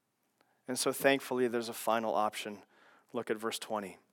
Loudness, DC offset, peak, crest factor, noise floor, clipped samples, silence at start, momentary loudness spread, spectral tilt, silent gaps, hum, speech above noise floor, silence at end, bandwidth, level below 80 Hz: -34 LUFS; under 0.1%; -12 dBFS; 22 dB; -75 dBFS; under 0.1%; 0.7 s; 13 LU; -3 dB/octave; none; none; 41 dB; 0.15 s; 18 kHz; under -90 dBFS